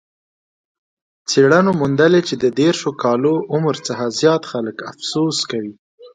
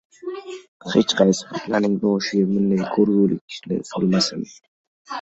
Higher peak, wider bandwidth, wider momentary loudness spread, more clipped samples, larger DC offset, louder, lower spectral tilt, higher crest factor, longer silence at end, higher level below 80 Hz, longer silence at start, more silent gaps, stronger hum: about the same, 0 dBFS vs -2 dBFS; first, 9.4 kHz vs 8.2 kHz; second, 12 LU vs 16 LU; neither; neither; first, -17 LUFS vs -20 LUFS; about the same, -5 dB/octave vs -5.5 dB/octave; about the same, 18 dB vs 20 dB; about the same, 0.05 s vs 0 s; about the same, -60 dBFS vs -60 dBFS; first, 1.3 s vs 0.25 s; second, 5.79-5.98 s vs 0.68-0.80 s, 3.41-3.48 s, 4.68-5.05 s; neither